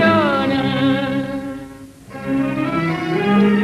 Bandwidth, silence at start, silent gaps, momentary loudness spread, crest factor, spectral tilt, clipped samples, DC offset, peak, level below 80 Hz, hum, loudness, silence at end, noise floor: 13 kHz; 0 s; none; 18 LU; 14 dB; -7 dB/octave; under 0.1%; under 0.1%; -4 dBFS; -48 dBFS; none; -18 LUFS; 0 s; -37 dBFS